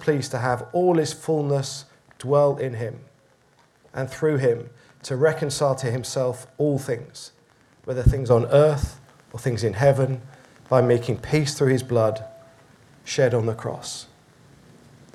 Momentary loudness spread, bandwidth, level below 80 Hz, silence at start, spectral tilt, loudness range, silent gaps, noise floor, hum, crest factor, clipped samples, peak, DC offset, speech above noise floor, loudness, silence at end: 17 LU; 13.5 kHz; -42 dBFS; 0 s; -6 dB/octave; 4 LU; none; -59 dBFS; none; 20 dB; under 0.1%; -4 dBFS; under 0.1%; 37 dB; -23 LUFS; 1.1 s